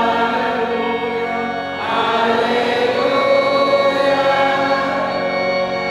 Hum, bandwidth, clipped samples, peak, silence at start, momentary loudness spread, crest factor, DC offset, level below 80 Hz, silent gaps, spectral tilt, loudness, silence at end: none; 12.5 kHz; under 0.1%; -4 dBFS; 0 s; 6 LU; 14 dB; under 0.1%; -54 dBFS; none; -5 dB/octave; -17 LUFS; 0 s